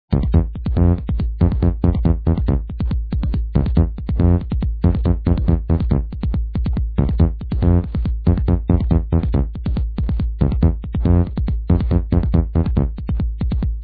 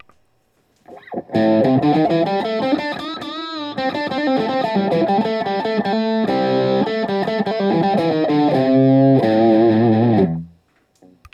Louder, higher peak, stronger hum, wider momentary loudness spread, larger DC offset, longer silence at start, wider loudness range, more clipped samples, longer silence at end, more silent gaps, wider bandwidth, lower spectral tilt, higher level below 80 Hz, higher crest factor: about the same, -19 LUFS vs -17 LUFS; about the same, -2 dBFS vs -4 dBFS; neither; second, 5 LU vs 10 LU; neither; second, 0.1 s vs 0.9 s; second, 1 LU vs 5 LU; neither; second, 0 s vs 0.85 s; neither; second, 4.7 kHz vs 8.2 kHz; first, -12.5 dB/octave vs -8 dB/octave; first, -20 dBFS vs -60 dBFS; about the same, 14 dB vs 14 dB